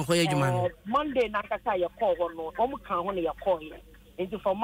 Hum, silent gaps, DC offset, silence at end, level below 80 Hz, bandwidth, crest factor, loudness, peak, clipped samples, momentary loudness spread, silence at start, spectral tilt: none; none; under 0.1%; 0 s; -54 dBFS; 16 kHz; 14 dB; -29 LUFS; -14 dBFS; under 0.1%; 7 LU; 0 s; -5.5 dB/octave